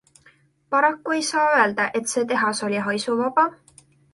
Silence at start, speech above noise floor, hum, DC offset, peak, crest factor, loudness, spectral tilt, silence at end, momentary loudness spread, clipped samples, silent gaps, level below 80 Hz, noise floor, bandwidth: 0.7 s; 36 dB; none; under 0.1%; -6 dBFS; 18 dB; -21 LUFS; -3 dB/octave; 0.6 s; 6 LU; under 0.1%; none; -68 dBFS; -57 dBFS; 11.5 kHz